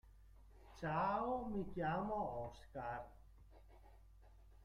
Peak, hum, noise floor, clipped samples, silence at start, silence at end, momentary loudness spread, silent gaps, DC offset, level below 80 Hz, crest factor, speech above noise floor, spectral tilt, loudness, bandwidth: -28 dBFS; none; -63 dBFS; under 0.1%; 0.05 s; 0 s; 12 LU; none; under 0.1%; -62 dBFS; 16 dB; 21 dB; -8 dB/octave; -43 LUFS; 14.5 kHz